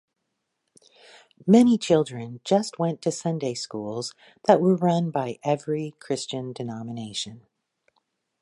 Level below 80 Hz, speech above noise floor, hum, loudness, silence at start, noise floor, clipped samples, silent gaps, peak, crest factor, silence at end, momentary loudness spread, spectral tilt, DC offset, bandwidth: -68 dBFS; 55 dB; none; -24 LUFS; 1.45 s; -79 dBFS; under 0.1%; none; -4 dBFS; 22 dB; 1.05 s; 14 LU; -6 dB/octave; under 0.1%; 11.5 kHz